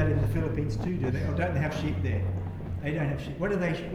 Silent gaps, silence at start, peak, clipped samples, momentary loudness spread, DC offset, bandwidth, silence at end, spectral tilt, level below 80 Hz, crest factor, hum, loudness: none; 0 s; -12 dBFS; under 0.1%; 4 LU; under 0.1%; 13 kHz; 0 s; -8 dB/octave; -40 dBFS; 16 dB; none; -30 LUFS